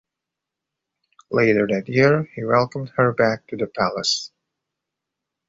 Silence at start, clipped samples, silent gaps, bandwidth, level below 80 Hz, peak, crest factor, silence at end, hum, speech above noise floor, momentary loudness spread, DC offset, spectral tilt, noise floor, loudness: 1.3 s; under 0.1%; none; 8 kHz; -60 dBFS; -4 dBFS; 20 dB; 1.2 s; none; 65 dB; 8 LU; under 0.1%; -5 dB/octave; -85 dBFS; -20 LUFS